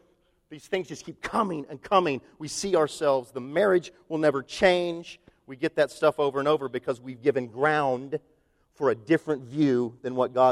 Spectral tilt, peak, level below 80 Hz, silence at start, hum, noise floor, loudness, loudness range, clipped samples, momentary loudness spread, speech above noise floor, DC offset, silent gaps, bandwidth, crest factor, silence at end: -5 dB/octave; -6 dBFS; -62 dBFS; 0.5 s; none; -66 dBFS; -26 LUFS; 2 LU; under 0.1%; 11 LU; 40 dB; under 0.1%; none; 13.5 kHz; 20 dB; 0 s